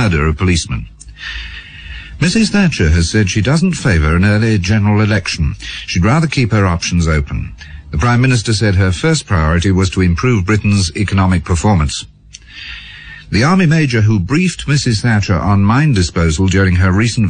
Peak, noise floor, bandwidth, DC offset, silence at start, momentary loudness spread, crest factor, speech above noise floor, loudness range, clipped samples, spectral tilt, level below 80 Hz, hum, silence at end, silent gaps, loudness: -2 dBFS; -36 dBFS; 9.8 kHz; under 0.1%; 0 s; 16 LU; 10 dB; 24 dB; 3 LU; under 0.1%; -5.5 dB/octave; -26 dBFS; none; 0 s; none; -13 LUFS